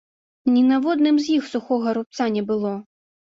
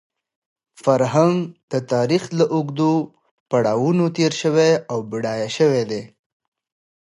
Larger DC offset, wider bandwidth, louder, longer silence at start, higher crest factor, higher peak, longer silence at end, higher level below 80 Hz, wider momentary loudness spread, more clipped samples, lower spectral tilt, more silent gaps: neither; second, 7.6 kHz vs 11.5 kHz; about the same, -21 LUFS vs -19 LUFS; second, 0.45 s vs 0.8 s; about the same, 14 dB vs 18 dB; second, -8 dBFS vs -2 dBFS; second, 0.4 s vs 0.95 s; about the same, -66 dBFS vs -64 dBFS; about the same, 8 LU vs 9 LU; neither; about the same, -6 dB/octave vs -6 dB/octave; second, 2.06-2.10 s vs 1.63-1.68 s, 3.31-3.46 s